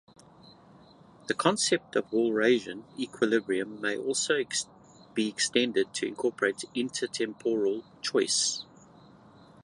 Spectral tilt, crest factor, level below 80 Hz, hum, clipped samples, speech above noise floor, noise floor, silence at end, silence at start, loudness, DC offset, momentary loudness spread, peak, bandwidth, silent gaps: -2.5 dB/octave; 22 dB; -74 dBFS; none; under 0.1%; 26 dB; -55 dBFS; 1 s; 0.45 s; -29 LUFS; under 0.1%; 10 LU; -8 dBFS; 11.5 kHz; none